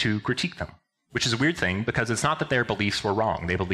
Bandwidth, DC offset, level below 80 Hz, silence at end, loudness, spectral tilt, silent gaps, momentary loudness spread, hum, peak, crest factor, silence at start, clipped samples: 14 kHz; under 0.1%; -50 dBFS; 0 s; -25 LUFS; -4.5 dB/octave; none; 7 LU; none; -10 dBFS; 16 dB; 0 s; under 0.1%